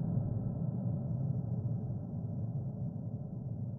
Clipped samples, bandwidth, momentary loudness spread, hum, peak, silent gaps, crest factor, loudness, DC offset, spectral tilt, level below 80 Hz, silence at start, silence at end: under 0.1%; 1.7 kHz; 6 LU; none; -22 dBFS; none; 14 dB; -38 LUFS; under 0.1%; -14 dB/octave; -56 dBFS; 0 s; 0 s